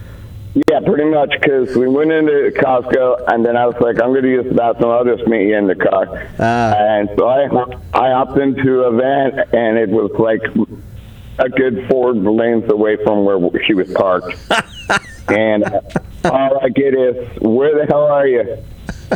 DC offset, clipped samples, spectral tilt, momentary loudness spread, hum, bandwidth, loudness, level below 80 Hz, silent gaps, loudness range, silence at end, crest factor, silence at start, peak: under 0.1%; under 0.1%; -6.5 dB/octave; 6 LU; none; 11 kHz; -14 LUFS; -40 dBFS; none; 2 LU; 0 s; 14 dB; 0 s; 0 dBFS